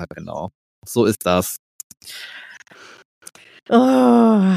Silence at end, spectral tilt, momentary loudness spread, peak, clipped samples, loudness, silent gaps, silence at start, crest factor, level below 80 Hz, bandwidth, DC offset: 0 s; -6 dB/octave; 22 LU; -2 dBFS; under 0.1%; -16 LUFS; 0.55-0.82 s, 1.59-1.90 s, 3.05-3.21 s, 3.62-3.66 s; 0 s; 18 dB; -56 dBFS; 15.5 kHz; under 0.1%